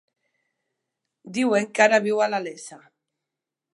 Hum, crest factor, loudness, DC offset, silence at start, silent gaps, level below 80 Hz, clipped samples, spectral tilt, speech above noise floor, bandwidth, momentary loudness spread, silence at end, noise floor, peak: none; 24 dB; -21 LUFS; under 0.1%; 1.25 s; none; -82 dBFS; under 0.1%; -4 dB/octave; 64 dB; 11.5 kHz; 19 LU; 1 s; -86 dBFS; -2 dBFS